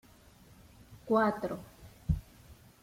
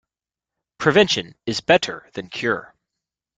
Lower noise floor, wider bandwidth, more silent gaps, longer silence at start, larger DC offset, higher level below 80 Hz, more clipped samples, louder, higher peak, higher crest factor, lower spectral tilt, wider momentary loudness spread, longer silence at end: second, -58 dBFS vs -89 dBFS; first, 16.5 kHz vs 9.4 kHz; neither; about the same, 0.9 s vs 0.8 s; neither; first, -48 dBFS vs -58 dBFS; neither; second, -33 LUFS vs -20 LUFS; second, -16 dBFS vs -2 dBFS; about the same, 20 dB vs 22 dB; first, -7.5 dB/octave vs -4 dB/octave; first, 21 LU vs 12 LU; second, 0.3 s vs 0.75 s